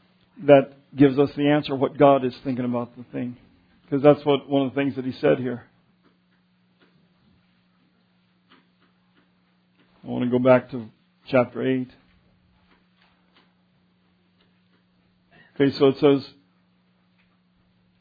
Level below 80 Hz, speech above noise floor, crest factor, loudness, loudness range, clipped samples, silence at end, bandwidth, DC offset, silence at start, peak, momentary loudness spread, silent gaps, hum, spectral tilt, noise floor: -64 dBFS; 43 dB; 24 dB; -21 LUFS; 9 LU; under 0.1%; 1.75 s; 5 kHz; under 0.1%; 0.4 s; -2 dBFS; 16 LU; none; none; -9.5 dB/octave; -64 dBFS